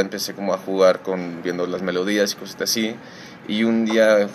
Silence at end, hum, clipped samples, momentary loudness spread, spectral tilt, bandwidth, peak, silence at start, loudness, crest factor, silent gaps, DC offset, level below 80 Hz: 0 s; none; under 0.1%; 10 LU; -4 dB/octave; 15.5 kHz; -4 dBFS; 0 s; -21 LUFS; 18 dB; none; under 0.1%; -68 dBFS